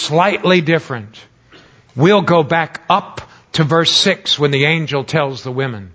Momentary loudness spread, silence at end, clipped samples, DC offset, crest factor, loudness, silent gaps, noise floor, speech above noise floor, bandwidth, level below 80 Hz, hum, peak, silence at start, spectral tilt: 12 LU; 0.05 s; under 0.1%; under 0.1%; 16 dB; -14 LUFS; none; -46 dBFS; 31 dB; 8 kHz; -52 dBFS; none; 0 dBFS; 0 s; -5 dB/octave